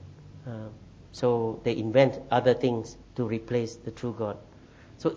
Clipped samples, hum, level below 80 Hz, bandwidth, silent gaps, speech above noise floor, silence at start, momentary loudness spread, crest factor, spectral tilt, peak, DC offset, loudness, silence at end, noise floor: under 0.1%; none; -56 dBFS; 8 kHz; none; 24 dB; 0 s; 20 LU; 22 dB; -7 dB/octave; -6 dBFS; under 0.1%; -28 LUFS; 0 s; -51 dBFS